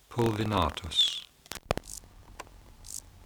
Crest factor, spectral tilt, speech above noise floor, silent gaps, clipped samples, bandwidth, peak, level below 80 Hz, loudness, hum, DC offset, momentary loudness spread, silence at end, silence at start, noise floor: 24 dB; -4 dB/octave; 21 dB; none; under 0.1%; over 20 kHz; -8 dBFS; -48 dBFS; -29 LUFS; none; under 0.1%; 23 LU; 0 s; 0.1 s; -50 dBFS